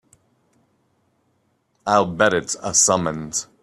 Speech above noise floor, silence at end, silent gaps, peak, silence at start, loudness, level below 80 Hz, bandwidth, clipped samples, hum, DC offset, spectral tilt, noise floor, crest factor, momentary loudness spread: 47 dB; 0.2 s; none; -2 dBFS; 1.85 s; -19 LUFS; -58 dBFS; 14.5 kHz; under 0.1%; none; under 0.1%; -2.5 dB/octave; -67 dBFS; 22 dB; 11 LU